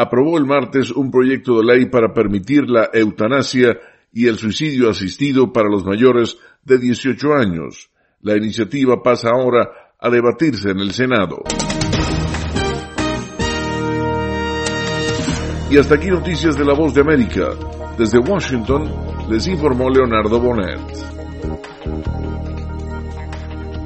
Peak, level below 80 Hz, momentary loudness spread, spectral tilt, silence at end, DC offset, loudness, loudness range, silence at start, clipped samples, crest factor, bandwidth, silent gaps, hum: 0 dBFS; -32 dBFS; 13 LU; -6 dB/octave; 0 s; under 0.1%; -16 LUFS; 5 LU; 0 s; under 0.1%; 16 dB; 8.8 kHz; none; none